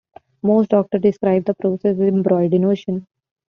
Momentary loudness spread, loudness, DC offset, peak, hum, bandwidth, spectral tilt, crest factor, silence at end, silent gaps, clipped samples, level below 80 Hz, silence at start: 7 LU; -18 LUFS; under 0.1%; -4 dBFS; none; 6.2 kHz; -9 dB/octave; 14 dB; 0.45 s; none; under 0.1%; -60 dBFS; 0.45 s